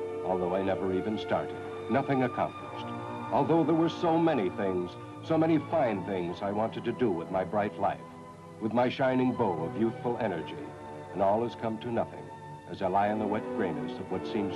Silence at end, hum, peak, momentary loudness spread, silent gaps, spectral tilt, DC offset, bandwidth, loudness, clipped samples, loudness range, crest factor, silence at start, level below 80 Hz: 0 s; none; -14 dBFS; 13 LU; none; -8 dB/octave; under 0.1%; 11.5 kHz; -30 LUFS; under 0.1%; 4 LU; 16 dB; 0 s; -66 dBFS